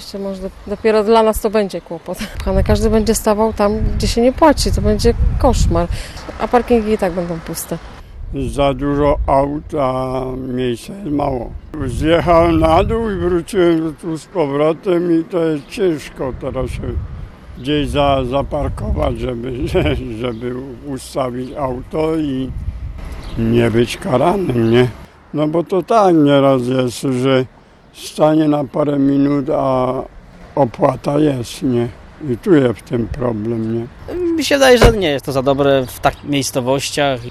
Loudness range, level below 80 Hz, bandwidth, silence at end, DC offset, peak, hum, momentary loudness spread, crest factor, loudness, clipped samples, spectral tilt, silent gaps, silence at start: 5 LU; -28 dBFS; 14 kHz; 0 s; under 0.1%; 0 dBFS; none; 13 LU; 14 dB; -16 LUFS; under 0.1%; -6 dB/octave; none; 0 s